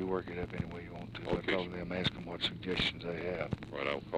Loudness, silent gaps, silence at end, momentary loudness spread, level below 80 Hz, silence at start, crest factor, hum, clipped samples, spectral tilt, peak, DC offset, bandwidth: -37 LUFS; none; 0 s; 8 LU; -54 dBFS; 0 s; 18 dB; none; under 0.1%; -6 dB/octave; -18 dBFS; under 0.1%; 11.5 kHz